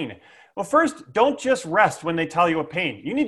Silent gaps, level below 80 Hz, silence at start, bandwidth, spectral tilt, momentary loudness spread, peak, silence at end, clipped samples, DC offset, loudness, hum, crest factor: none; -62 dBFS; 0 s; 12.5 kHz; -5 dB/octave; 8 LU; -2 dBFS; 0 s; under 0.1%; under 0.1%; -21 LUFS; none; 20 dB